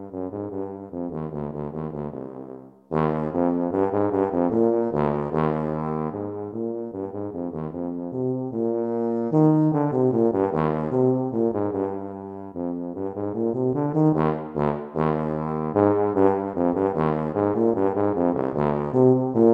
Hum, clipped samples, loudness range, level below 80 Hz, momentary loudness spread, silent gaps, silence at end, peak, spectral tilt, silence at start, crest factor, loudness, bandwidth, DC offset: none; under 0.1%; 6 LU; -52 dBFS; 11 LU; none; 0 s; -4 dBFS; -11 dB/octave; 0 s; 18 dB; -24 LUFS; 5 kHz; under 0.1%